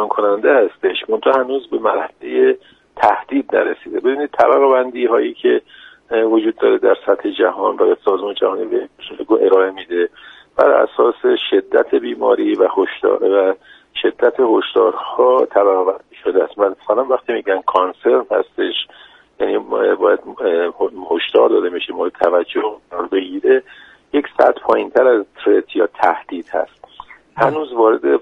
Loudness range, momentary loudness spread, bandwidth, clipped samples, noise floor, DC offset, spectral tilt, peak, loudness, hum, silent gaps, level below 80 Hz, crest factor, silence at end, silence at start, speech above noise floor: 2 LU; 8 LU; 5.2 kHz; under 0.1%; -40 dBFS; under 0.1%; -6 dB/octave; 0 dBFS; -16 LUFS; none; none; -60 dBFS; 16 dB; 0 s; 0 s; 25 dB